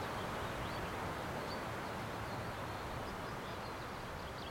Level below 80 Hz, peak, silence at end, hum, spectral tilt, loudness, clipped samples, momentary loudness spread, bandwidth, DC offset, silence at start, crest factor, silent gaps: -56 dBFS; -28 dBFS; 0 s; none; -5 dB/octave; -43 LUFS; under 0.1%; 3 LU; 16.5 kHz; under 0.1%; 0 s; 14 dB; none